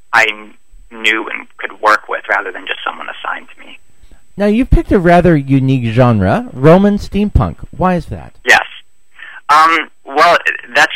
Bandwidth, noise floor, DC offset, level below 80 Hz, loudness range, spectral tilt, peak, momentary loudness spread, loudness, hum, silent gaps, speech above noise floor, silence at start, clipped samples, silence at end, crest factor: 16 kHz; -44 dBFS; 2%; -26 dBFS; 6 LU; -6 dB/octave; 0 dBFS; 14 LU; -12 LUFS; none; none; 32 dB; 0.1 s; 0.2%; 0 s; 14 dB